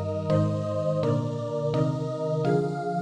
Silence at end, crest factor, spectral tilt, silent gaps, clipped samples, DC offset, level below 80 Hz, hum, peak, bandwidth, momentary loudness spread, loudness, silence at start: 0 s; 14 dB; -8.5 dB/octave; none; under 0.1%; under 0.1%; -58 dBFS; none; -12 dBFS; 9.4 kHz; 4 LU; -27 LUFS; 0 s